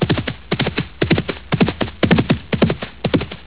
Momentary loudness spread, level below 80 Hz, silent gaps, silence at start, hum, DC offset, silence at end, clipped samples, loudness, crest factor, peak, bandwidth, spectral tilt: 6 LU; -34 dBFS; none; 0 s; none; 0.8%; 0 s; under 0.1%; -19 LUFS; 18 dB; 0 dBFS; 4 kHz; -10.5 dB/octave